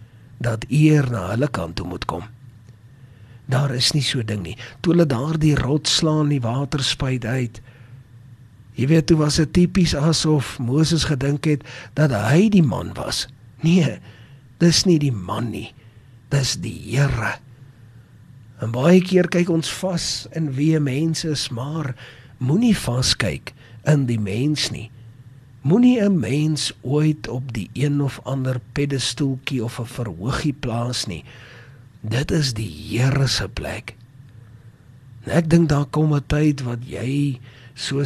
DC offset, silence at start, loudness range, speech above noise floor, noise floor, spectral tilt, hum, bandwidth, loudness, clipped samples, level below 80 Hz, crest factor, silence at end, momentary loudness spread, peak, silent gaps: under 0.1%; 0 s; 5 LU; 27 dB; -46 dBFS; -5.5 dB/octave; none; 13.5 kHz; -20 LUFS; under 0.1%; -42 dBFS; 18 dB; 0 s; 13 LU; -2 dBFS; none